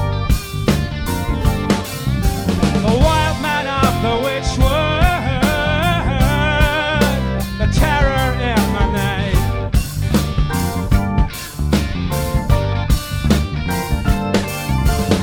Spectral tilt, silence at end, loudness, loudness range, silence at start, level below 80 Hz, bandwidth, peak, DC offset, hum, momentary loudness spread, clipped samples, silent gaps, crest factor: -5.5 dB/octave; 0 s; -17 LUFS; 3 LU; 0 s; -22 dBFS; 19.5 kHz; 0 dBFS; under 0.1%; none; 5 LU; under 0.1%; none; 16 dB